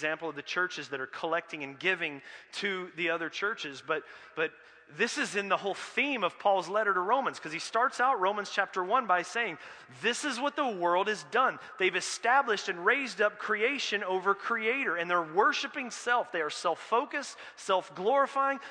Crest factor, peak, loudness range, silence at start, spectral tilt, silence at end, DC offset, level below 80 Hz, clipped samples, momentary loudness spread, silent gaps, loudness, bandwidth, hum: 20 dB; -12 dBFS; 5 LU; 0 s; -2.5 dB/octave; 0 s; under 0.1%; -86 dBFS; under 0.1%; 8 LU; none; -30 LUFS; 10.5 kHz; none